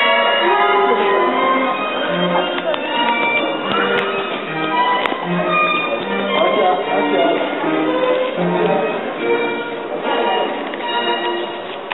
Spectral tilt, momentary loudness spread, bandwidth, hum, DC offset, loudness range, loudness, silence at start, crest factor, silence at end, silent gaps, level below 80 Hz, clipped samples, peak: -2 dB/octave; 7 LU; 4.2 kHz; none; 0.4%; 3 LU; -17 LUFS; 0 s; 18 dB; 0 s; none; -64 dBFS; under 0.1%; 0 dBFS